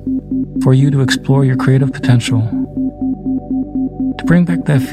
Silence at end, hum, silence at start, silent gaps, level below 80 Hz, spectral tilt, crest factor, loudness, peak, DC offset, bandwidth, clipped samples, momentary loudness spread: 0 s; 50 Hz at -35 dBFS; 0 s; none; -38 dBFS; -7 dB/octave; 12 dB; -14 LUFS; 0 dBFS; under 0.1%; 12.5 kHz; under 0.1%; 8 LU